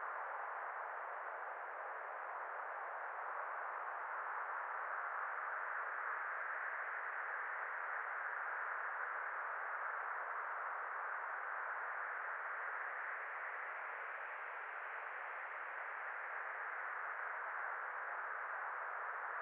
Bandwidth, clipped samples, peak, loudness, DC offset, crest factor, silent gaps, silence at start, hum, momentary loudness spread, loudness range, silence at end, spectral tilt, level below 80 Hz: 4.2 kHz; under 0.1%; -30 dBFS; -44 LUFS; under 0.1%; 14 dB; none; 0 s; none; 4 LU; 3 LU; 0 s; 5.5 dB/octave; under -90 dBFS